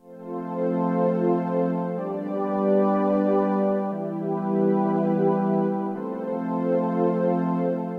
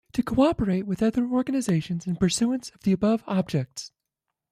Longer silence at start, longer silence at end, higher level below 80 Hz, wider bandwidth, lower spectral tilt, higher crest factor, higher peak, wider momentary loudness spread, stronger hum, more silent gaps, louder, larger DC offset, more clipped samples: about the same, 0.05 s vs 0.15 s; second, 0 s vs 0.65 s; second, -74 dBFS vs -50 dBFS; second, 4.7 kHz vs 14.5 kHz; first, -11 dB/octave vs -6 dB/octave; about the same, 14 dB vs 16 dB; about the same, -10 dBFS vs -8 dBFS; about the same, 7 LU vs 8 LU; neither; neither; about the same, -24 LUFS vs -25 LUFS; neither; neither